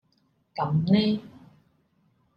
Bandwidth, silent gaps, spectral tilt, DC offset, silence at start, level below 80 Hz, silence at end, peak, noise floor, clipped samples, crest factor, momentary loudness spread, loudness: 5.4 kHz; none; -9 dB/octave; under 0.1%; 0.55 s; -64 dBFS; 1.1 s; -10 dBFS; -69 dBFS; under 0.1%; 18 dB; 11 LU; -25 LUFS